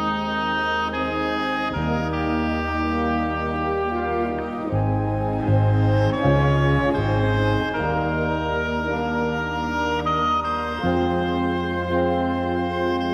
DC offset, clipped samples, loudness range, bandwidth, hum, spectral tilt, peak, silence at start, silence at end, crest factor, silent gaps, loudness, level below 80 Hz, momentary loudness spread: under 0.1%; under 0.1%; 3 LU; 7.2 kHz; none; -7.5 dB/octave; -8 dBFS; 0 s; 0 s; 14 dB; none; -22 LUFS; -36 dBFS; 5 LU